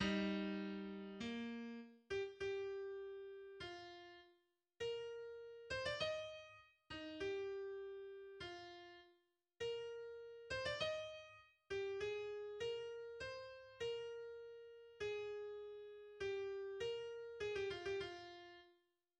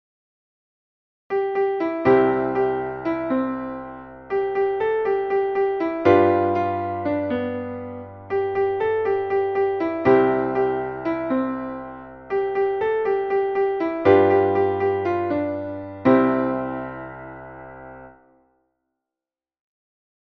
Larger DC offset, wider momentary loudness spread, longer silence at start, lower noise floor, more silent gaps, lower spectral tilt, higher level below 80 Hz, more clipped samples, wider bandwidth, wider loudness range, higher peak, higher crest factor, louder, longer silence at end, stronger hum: neither; second, 13 LU vs 17 LU; second, 0 s vs 1.3 s; second, -80 dBFS vs under -90 dBFS; neither; second, -5 dB/octave vs -9 dB/octave; second, -74 dBFS vs -56 dBFS; neither; first, 9.8 kHz vs 5.6 kHz; about the same, 4 LU vs 4 LU; second, -28 dBFS vs -4 dBFS; about the same, 20 dB vs 18 dB; second, -48 LUFS vs -22 LUFS; second, 0.45 s vs 2.3 s; neither